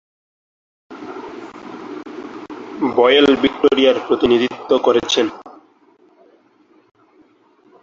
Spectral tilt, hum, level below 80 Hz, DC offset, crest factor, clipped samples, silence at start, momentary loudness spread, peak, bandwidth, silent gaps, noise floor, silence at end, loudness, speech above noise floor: -4 dB/octave; none; -54 dBFS; under 0.1%; 18 dB; under 0.1%; 0.9 s; 21 LU; -2 dBFS; 7.6 kHz; none; -54 dBFS; 2.3 s; -15 LUFS; 40 dB